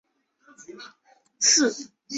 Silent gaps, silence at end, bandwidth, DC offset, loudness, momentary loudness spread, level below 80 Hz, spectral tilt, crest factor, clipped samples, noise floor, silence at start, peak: none; 0 s; 8 kHz; under 0.1%; -20 LUFS; 25 LU; -76 dBFS; 0.5 dB/octave; 22 dB; under 0.1%; -59 dBFS; 0.7 s; -6 dBFS